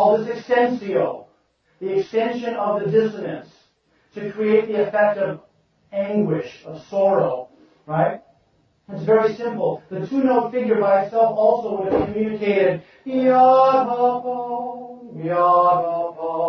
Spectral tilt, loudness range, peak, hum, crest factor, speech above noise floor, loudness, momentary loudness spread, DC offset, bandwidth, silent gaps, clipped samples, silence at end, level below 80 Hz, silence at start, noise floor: -8 dB/octave; 6 LU; -4 dBFS; none; 16 dB; 43 dB; -20 LUFS; 15 LU; under 0.1%; 6.4 kHz; none; under 0.1%; 0 s; -58 dBFS; 0 s; -62 dBFS